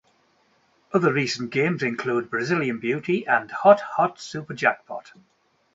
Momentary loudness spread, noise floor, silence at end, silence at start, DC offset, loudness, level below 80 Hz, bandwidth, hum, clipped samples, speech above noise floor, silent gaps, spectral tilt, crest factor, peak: 13 LU; -64 dBFS; 0.75 s; 0.95 s; under 0.1%; -23 LUFS; -68 dBFS; 8 kHz; none; under 0.1%; 41 dB; none; -5.5 dB/octave; 22 dB; -2 dBFS